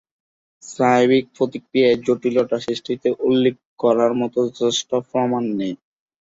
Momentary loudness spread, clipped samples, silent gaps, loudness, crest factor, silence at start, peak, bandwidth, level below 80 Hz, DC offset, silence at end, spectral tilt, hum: 8 LU; under 0.1%; 3.65-3.77 s; -19 LUFS; 16 dB; 0.65 s; -4 dBFS; 8 kHz; -62 dBFS; under 0.1%; 0.45 s; -5 dB/octave; none